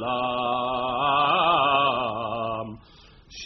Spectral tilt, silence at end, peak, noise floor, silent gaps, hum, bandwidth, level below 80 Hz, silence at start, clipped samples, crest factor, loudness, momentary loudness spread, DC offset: -1.5 dB/octave; 0 s; -8 dBFS; -51 dBFS; none; none; 6.2 kHz; -54 dBFS; 0 s; under 0.1%; 16 dB; -23 LUFS; 12 LU; under 0.1%